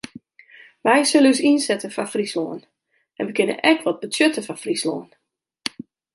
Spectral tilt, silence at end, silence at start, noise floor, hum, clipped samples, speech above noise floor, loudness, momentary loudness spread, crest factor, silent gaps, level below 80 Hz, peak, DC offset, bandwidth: -3 dB/octave; 1.1 s; 0.85 s; -49 dBFS; none; under 0.1%; 29 dB; -20 LUFS; 15 LU; 20 dB; none; -70 dBFS; -2 dBFS; under 0.1%; 11.5 kHz